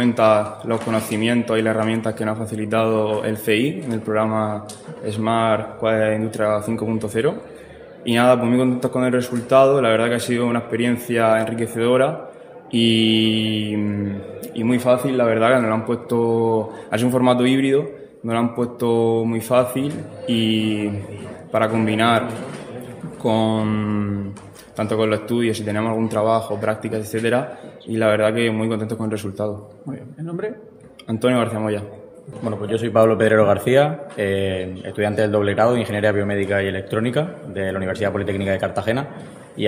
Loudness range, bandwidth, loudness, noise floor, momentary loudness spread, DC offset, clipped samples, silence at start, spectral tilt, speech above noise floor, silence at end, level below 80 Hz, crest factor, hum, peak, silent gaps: 4 LU; 16 kHz; -20 LUFS; -40 dBFS; 14 LU; under 0.1%; under 0.1%; 0 s; -6 dB/octave; 20 dB; 0 s; -60 dBFS; 20 dB; none; 0 dBFS; none